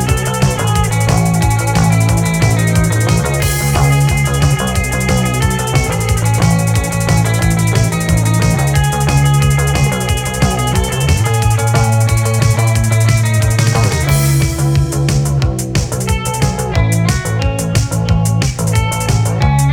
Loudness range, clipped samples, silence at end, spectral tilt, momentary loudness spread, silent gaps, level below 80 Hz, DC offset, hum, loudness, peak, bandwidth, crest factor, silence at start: 2 LU; under 0.1%; 0 s; -5 dB/octave; 3 LU; none; -22 dBFS; under 0.1%; none; -13 LUFS; 0 dBFS; 18 kHz; 12 dB; 0 s